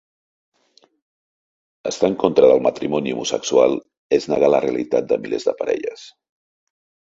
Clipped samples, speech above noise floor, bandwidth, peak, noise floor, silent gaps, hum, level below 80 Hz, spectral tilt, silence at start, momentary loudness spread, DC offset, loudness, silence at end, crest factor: under 0.1%; 40 dB; 7.8 kHz; 0 dBFS; -58 dBFS; 3.98-4.10 s; none; -60 dBFS; -4.5 dB/octave; 1.85 s; 10 LU; under 0.1%; -19 LUFS; 0.9 s; 20 dB